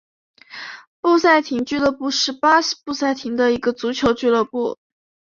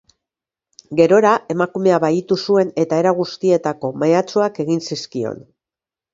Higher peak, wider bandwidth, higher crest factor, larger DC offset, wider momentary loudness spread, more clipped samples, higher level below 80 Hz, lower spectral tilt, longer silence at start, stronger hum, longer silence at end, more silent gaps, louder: about the same, -2 dBFS vs 0 dBFS; about the same, 7.4 kHz vs 7.8 kHz; about the same, 18 dB vs 18 dB; neither; first, 18 LU vs 11 LU; neither; first, -54 dBFS vs -64 dBFS; second, -3 dB/octave vs -6 dB/octave; second, 0.5 s vs 0.9 s; neither; second, 0.5 s vs 0.75 s; first, 0.87-1.03 s vs none; about the same, -19 LUFS vs -17 LUFS